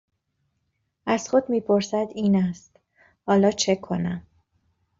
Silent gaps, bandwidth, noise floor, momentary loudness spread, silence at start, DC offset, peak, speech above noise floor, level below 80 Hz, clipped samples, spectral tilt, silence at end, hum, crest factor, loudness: none; 7.8 kHz; -75 dBFS; 14 LU; 1.05 s; under 0.1%; -8 dBFS; 52 dB; -62 dBFS; under 0.1%; -5.5 dB/octave; 0.8 s; none; 18 dB; -23 LUFS